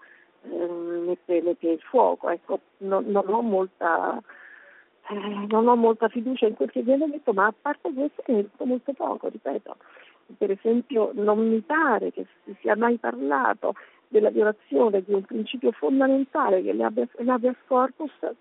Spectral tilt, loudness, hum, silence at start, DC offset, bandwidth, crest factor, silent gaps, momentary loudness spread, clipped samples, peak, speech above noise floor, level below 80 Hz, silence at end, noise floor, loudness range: -4.5 dB/octave; -24 LUFS; none; 0.45 s; under 0.1%; 4 kHz; 18 dB; none; 10 LU; under 0.1%; -6 dBFS; 29 dB; -78 dBFS; 0.05 s; -53 dBFS; 4 LU